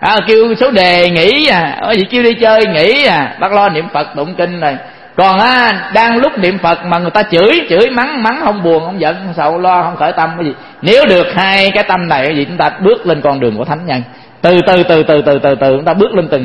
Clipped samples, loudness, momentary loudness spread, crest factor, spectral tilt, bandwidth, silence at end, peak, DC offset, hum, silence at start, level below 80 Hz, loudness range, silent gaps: 0.4%; -10 LUFS; 8 LU; 10 dB; -6.5 dB/octave; 11 kHz; 0 s; 0 dBFS; 0.3%; none; 0 s; -44 dBFS; 3 LU; none